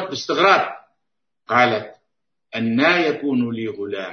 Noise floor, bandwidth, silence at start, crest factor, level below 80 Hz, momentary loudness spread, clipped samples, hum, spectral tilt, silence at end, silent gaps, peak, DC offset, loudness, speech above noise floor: -82 dBFS; 6.6 kHz; 0 s; 20 dB; -68 dBFS; 13 LU; under 0.1%; none; -5 dB/octave; 0 s; none; -2 dBFS; under 0.1%; -19 LUFS; 63 dB